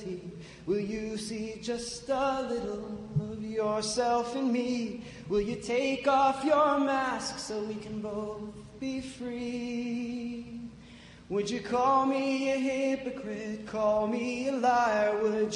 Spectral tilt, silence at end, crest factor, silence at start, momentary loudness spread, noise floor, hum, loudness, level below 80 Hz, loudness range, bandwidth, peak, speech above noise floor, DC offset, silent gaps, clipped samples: -5 dB/octave; 0 s; 16 dB; 0 s; 14 LU; -51 dBFS; none; -30 LUFS; -58 dBFS; 8 LU; 11 kHz; -14 dBFS; 21 dB; under 0.1%; none; under 0.1%